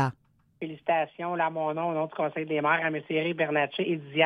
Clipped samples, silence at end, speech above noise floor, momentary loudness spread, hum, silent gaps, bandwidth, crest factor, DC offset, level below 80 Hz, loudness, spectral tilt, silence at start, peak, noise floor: under 0.1%; 0 s; 26 dB; 6 LU; none; none; 9.6 kHz; 18 dB; under 0.1%; -76 dBFS; -28 LUFS; -7 dB/octave; 0 s; -10 dBFS; -54 dBFS